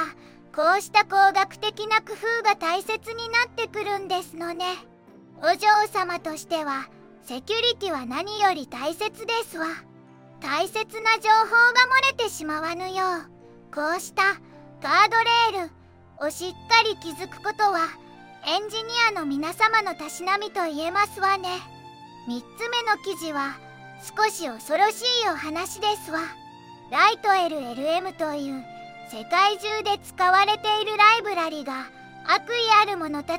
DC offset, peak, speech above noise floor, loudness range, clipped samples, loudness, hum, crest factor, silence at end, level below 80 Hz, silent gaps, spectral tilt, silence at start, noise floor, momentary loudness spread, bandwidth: under 0.1%; -4 dBFS; 26 dB; 6 LU; under 0.1%; -23 LUFS; none; 22 dB; 0 s; -68 dBFS; none; -2 dB/octave; 0 s; -50 dBFS; 16 LU; 16.5 kHz